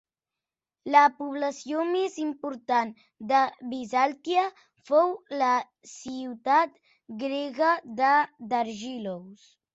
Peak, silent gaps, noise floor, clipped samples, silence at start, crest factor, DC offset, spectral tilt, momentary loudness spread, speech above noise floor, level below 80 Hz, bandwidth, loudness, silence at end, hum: -6 dBFS; none; -90 dBFS; under 0.1%; 0.85 s; 20 dB; under 0.1%; -4 dB/octave; 14 LU; 63 dB; -76 dBFS; 8 kHz; -26 LUFS; 0.4 s; none